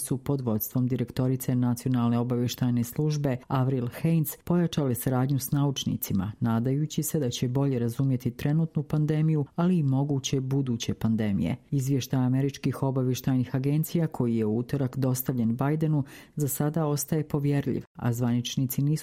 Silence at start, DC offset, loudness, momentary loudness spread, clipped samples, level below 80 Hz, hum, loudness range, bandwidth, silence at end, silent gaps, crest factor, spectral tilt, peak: 0 s; under 0.1%; -27 LUFS; 3 LU; under 0.1%; -56 dBFS; none; 1 LU; 16 kHz; 0 s; 17.87-17.95 s; 14 dB; -6.5 dB/octave; -14 dBFS